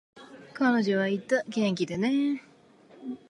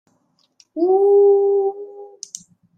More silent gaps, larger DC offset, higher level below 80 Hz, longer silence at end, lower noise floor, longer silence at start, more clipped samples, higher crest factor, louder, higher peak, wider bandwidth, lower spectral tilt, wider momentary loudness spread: neither; neither; first, -72 dBFS vs -82 dBFS; second, 0.15 s vs 0.7 s; second, -56 dBFS vs -64 dBFS; second, 0.15 s vs 0.75 s; neither; about the same, 16 dB vs 12 dB; second, -27 LUFS vs -16 LUFS; second, -12 dBFS vs -6 dBFS; first, 11 kHz vs 9 kHz; about the same, -6 dB/octave vs -5 dB/octave; second, 15 LU vs 23 LU